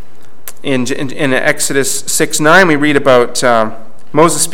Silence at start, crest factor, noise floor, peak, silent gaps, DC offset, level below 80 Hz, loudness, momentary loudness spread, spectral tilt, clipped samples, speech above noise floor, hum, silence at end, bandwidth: 0.45 s; 14 dB; -35 dBFS; 0 dBFS; none; 10%; -50 dBFS; -11 LUFS; 11 LU; -3.5 dB/octave; 0.7%; 24 dB; none; 0 s; 17.5 kHz